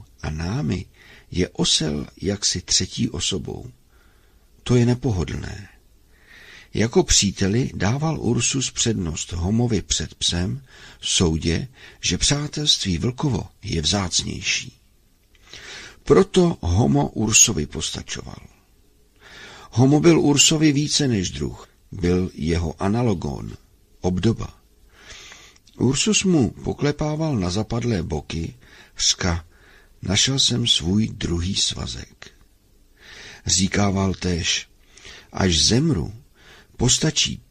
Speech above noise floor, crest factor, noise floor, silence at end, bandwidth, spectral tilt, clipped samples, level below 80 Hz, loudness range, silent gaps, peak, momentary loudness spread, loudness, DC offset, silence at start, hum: 36 dB; 20 dB; -57 dBFS; 0.15 s; 15 kHz; -4 dB/octave; under 0.1%; -40 dBFS; 5 LU; none; -2 dBFS; 18 LU; -20 LUFS; under 0.1%; 0 s; none